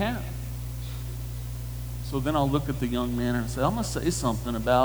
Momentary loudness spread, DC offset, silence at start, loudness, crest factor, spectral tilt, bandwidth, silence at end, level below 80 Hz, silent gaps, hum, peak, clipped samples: 10 LU; under 0.1%; 0 s; -29 LUFS; 18 dB; -6 dB/octave; over 20 kHz; 0 s; -38 dBFS; none; 60 Hz at -35 dBFS; -10 dBFS; under 0.1%